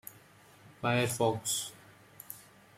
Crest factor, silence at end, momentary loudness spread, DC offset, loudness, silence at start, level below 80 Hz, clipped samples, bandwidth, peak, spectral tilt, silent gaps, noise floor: 20 dB; 0.35 s; 19 LU; under 0.1%; -32 LUFS; 0.05 s; -70 dBFS; under 0.1%; 16.5 kHz; -16 dBFS; -3.5 dB/octave; none; -58 dBFS